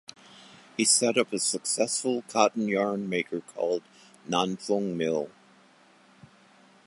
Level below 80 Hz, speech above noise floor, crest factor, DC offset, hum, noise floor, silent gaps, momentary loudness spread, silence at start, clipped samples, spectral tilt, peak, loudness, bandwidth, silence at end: -76 dBFS; 31 dB; 22 dB; under 0.1%; none; -58 dBFS; none; 12 LU; 0.4 s; under 0.1%; -3 dB/octave; -6 dBFS; -27 LUFS; 11.5 kHz; 1.6 s